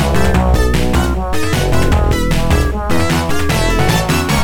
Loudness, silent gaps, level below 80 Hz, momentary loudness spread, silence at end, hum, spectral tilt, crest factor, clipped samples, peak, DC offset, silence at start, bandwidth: -15 LUFS; none; -18 dBFS; 3 LU; 0 s; none; -5.5 dB/octave; 10 dB; under 0.1%; -2 dBFS; under 0.1%; 0 s; 18.5 kHz